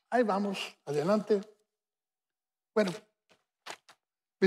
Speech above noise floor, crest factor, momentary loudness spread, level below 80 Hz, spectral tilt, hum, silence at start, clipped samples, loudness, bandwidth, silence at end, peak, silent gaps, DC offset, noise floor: over 60 dB; 20 dB; 19 LU; -90 dBFS; -6 dB/octave; none; 0.1 s; under 0.1%; -31 LUFS; 14 kHz; 0 s; -14 dBFS; none; under 0.1%; under -90 dBFS